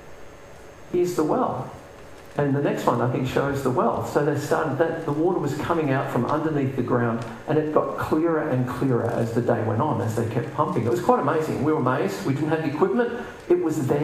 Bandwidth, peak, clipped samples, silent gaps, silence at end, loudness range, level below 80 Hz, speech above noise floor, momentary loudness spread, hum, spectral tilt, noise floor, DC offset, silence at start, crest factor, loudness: 15.5 kHz; -4 dBFS; under 0.1%; none; 0 s; 1 LU; -56 dBFS; 20 dB; 4 LU; none; -7.5 dB/octave; -43 dBFS; under 0.1%; 0 s; 20 dB; -24 LUFS